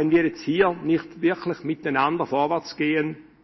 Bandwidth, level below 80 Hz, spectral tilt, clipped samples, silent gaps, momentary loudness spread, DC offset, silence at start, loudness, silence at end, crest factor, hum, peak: 6 kHz; -60 dBFS; -7 dB/octave; under 0.1%; none; 7 LU; under 0.1%; 0 s; -24 LUFS; 0.2 s; 18 dB; none; -6 dBFS